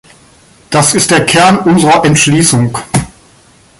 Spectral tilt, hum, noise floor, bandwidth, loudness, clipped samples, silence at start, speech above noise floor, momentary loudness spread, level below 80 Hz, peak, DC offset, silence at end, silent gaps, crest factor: -4 dB/octave; none; -43 dBFS; 16 kHz; -8 LUFS; under 0.1%; 0.7 s; 35 dB; 8 LU; -40 dBFS; 0 dBFS; under 0.1%; 0.7 s; none; 10 dB